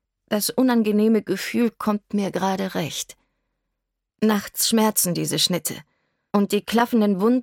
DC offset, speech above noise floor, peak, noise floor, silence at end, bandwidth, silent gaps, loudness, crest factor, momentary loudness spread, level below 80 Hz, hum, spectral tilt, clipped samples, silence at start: under 0.1%; 59 dB; -4 dBFS; -80 dBFS; 0 s; 17.5 kHz; none; -22 LUFS; 18 dB; 8 LU; -64 dBFS; none; -4 dB/octave; under 0.1%; 0.3 s